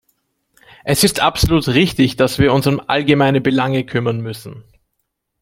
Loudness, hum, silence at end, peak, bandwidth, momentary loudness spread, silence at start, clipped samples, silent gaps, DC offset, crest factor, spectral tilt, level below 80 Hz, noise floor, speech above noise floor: -15 LUFS; none; 0.8 s; -2 dBFS; 16.5 kHz; 11 LU; 0.85 s; under 0.1%; none; under 0.1%; 16 dB; -5 dB/octave; -36 dBFS; -72 dBFS; 57 dB